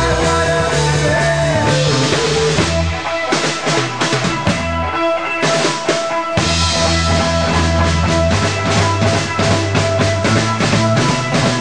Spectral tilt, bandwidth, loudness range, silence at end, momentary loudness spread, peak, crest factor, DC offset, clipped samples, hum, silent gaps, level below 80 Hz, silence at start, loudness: -4.5 dB/octave; 10 kHz; 2 LU; 0 s; 3 LU; -2 dBFS; 12 dB; 1%; under 0.1%; none; none; -30 dBFS; 0 s; -15 LUFS